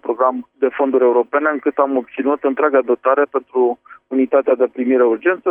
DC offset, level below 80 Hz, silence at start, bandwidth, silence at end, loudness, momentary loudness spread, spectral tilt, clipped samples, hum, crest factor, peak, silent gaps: under 0.1%; -68 dBFS; 0.05 s; 3.6 kHz; 0 s; -17 LUFS; 5 LU; -8.5 dB/octave; under 0.1%; none; 16 dB; 0 dBFS; none